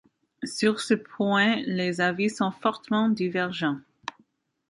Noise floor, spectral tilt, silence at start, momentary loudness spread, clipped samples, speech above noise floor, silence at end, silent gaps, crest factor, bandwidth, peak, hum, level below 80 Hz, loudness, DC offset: -66 dBFS; -5 dB/octave; 0.4 s; 13 LU; under 0.1%; 40 dB; 0.9 s; none; 18 dB; 11.5 kHz; -8 dBFS; none; -72 dBFS; -26 LUFS; under 0.1%